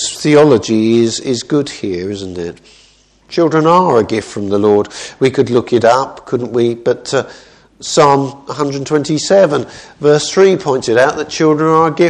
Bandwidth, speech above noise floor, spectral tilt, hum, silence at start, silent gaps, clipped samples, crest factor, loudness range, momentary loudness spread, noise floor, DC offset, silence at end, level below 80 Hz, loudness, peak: 10.5 kHz; 36 dB; -5 dB/octave; none; 0 s; none; 0.1%; 12 dB; 3 LU; 11 LU; -48 dBFS; under 0.1%; 0 s; -52 dBFS; -13 LUFS; 0 dBFS